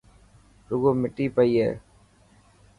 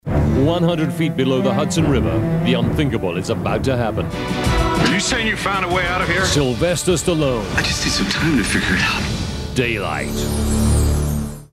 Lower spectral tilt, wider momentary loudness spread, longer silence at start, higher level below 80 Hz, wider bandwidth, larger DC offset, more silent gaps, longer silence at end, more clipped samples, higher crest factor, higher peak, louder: first, -8.5 dB/octave vs -5 dB/octave; first, 9 LU vs 5 LU; first, 0.7 s vs 0.05 s; second, -56 dBFS vs -28 dBFS; second, 11 kHz vs 15 kHz; neither; neither; first, 1 s vs 0.05 s; neither; about the same, 18 dB vs 14 dB; second, -8 dBFS vs -4 dBFS; second, -24 LUFS vs -18 LUFS